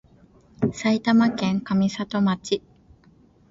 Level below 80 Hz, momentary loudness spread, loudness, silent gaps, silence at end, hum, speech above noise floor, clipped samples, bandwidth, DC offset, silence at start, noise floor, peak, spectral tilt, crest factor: -58 dBFS; 8 LU; -23 LUFS; none; 0.9 s; none; 34 dB; under 0.1%; 7.8 kHz; under 0.1%; 0.6 s; -55 dBFS; -8 dBFS; -6 dB/octave; 16 dB